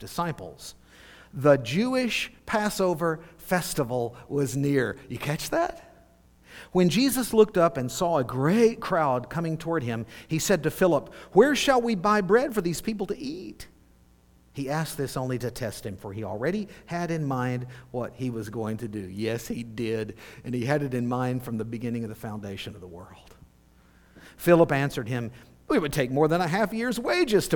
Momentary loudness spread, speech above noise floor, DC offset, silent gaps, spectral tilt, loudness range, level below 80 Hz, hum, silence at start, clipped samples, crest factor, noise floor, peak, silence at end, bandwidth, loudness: 15 LU; 32 dB; under 0.1%; none; -5.5 dB/octave; 9 LU; -54 dBFS; none; 0 s; under 0.1%; 22 dB; -58 dBFS; -4 dBFS; 0 s; 19 kHz; -26 LUFS